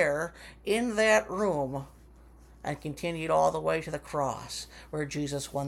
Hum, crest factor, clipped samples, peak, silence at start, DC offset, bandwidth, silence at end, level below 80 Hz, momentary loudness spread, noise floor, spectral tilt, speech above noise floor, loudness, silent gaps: none; 18 dB; under 0.1%; -12 dBFS; 0 s; under 0.1%; 16.5 kHz; 0 s; -54 dBFS; 14 LU; -54 dBFS; -4.5 dB/octave; 24 dB; -30 LUFS; none